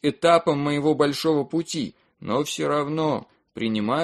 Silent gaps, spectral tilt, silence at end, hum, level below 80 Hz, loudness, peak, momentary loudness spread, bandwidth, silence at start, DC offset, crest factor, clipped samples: none; -5.5 dB/octave; 0 s; none; -62 dBFS; -23 LUFS; -4 dBFS; 11 LU; 13 kHz; 0.05 s; under 0.1%; 18 dB; under 0.1%